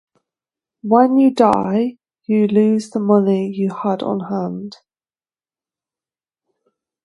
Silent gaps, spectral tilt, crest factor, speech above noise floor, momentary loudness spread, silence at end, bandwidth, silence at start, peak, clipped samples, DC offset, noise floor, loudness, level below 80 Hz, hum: none; -8 dB/octave; 18 dB; over 74 dB; 13 LU; 2.35 s; 11 kHz; 0.85 s; 0 dBFS; under 0.1%; under 0.1%; under -90 dBFS; -17 LUFS; -60 dBFS; none